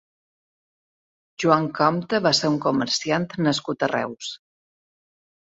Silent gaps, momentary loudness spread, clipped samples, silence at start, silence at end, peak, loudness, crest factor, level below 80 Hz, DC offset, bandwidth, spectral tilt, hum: none; 10 LU; under 0.1%; 1.4 s; 1.05 s; -2 dBFS; -22 LUFS; 22 dB; -66 dBFS; under 0.1%; 8 kHz; -4.5 dB/octave; none